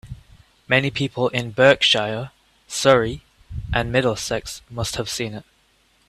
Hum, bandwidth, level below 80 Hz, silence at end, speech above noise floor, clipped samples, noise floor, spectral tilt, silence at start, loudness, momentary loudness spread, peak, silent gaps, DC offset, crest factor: none; 14.5 kHz; -42 dBFS; 0.65 s; 40 dB; under 0.1%; -60 dBFS; -4 dB/octave; 0.05 s; -20 LUFS; 20 LU; 0 dBFS; none; under 0.1%; 22 dB